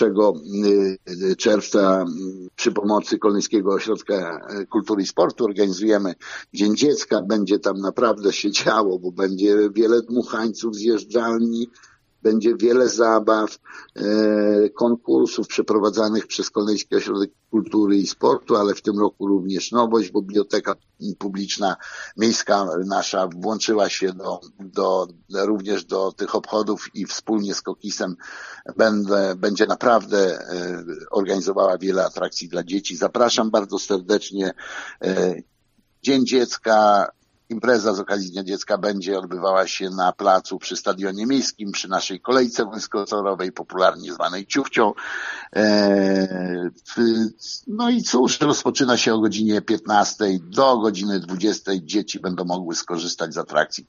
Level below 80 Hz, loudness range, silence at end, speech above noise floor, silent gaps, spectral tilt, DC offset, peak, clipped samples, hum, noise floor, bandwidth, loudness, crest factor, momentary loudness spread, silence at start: -68 dBFS; 3 LU; 0.1 s; 43 dB; none; -3.5 dB/octave; under 0.1%; -2 dBFS; under 0.1%; none; -64 dBFS; 7.6 kHz; -21 LUFS; 20 dB; 10 LU; 0 s